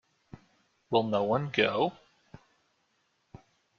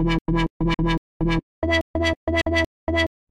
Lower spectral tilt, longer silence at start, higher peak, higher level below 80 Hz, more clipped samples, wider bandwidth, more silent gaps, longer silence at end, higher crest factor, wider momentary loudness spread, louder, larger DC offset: second, -3.5 dB/octave vs -6 dB/octave; first, 0.9 s vs 0 s; about the same, -10 dBFS vs -8 dBFS; second, -70 dBFS vs -32 dBFS; neither; second, 7 kHz vs 11 kHz; second, none vs 0.21-0.25 s, 0.50-0.60 s, 0.98-1.20 s, 1.43-1.62 s, 1.81-1.94 s, 2.16-2.27 s, 2.66-2.87 s; first, 1.85 s vs 0.25 s; first, 24 dB vs 14 dB; about the same, 4 LU vs 3 LU; second, -29 LUFS vs -23 LUFS; neither